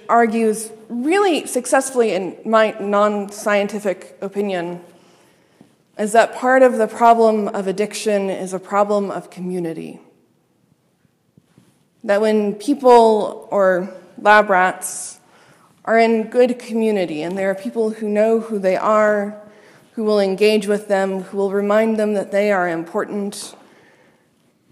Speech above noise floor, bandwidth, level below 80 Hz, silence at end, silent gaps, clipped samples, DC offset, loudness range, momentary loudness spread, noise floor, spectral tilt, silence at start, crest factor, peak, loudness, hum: 44 dB; 15 kHz; -70 dBFS; 1.2 s; none; under 0.1%; under 0.1%; 7 LU; 13 LU; -61 dBFS; -4.5 dB/octave; 0.1 s; 18 dB; 0 dBFS; -18 LUFS; none